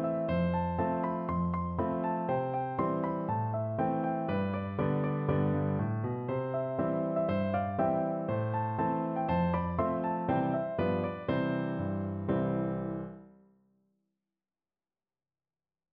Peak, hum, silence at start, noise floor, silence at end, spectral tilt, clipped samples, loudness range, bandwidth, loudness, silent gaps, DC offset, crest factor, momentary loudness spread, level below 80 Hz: -16 dBFS; none; 0 s; under -90 dBFS; 2.65 s; -11.5 dB/octave; under 0.1%; 5 LU; 4.5 kHz; -32 LUFS; none; under 0.1%; 16 dB; 3 LU; -56 dBFS